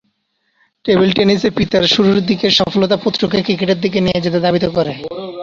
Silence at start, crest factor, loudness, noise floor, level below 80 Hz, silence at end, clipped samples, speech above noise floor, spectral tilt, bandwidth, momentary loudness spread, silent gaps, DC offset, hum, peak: 0.85 s; 14 dB; -14 LUFS; -65 dBFS; -44 dBFS; 0 s; under 0.1%; 52 dB; -6 dB/octave; 7.4 kHz; 6 LU; none; under 0.1%; none; 0 dBFS